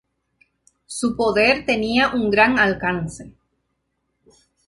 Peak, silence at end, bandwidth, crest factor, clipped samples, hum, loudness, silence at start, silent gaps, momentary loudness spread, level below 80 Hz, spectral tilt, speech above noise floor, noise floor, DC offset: -2 dBFS; 1.4 s; 11.5 kHz; 20 dB; under 0.1%; none; -18 LUFS; 0.9 s; none; 14 LU; -48 dBFS; -4.5 dB/octave; 54 dB; -73 dBFS; under 0.1%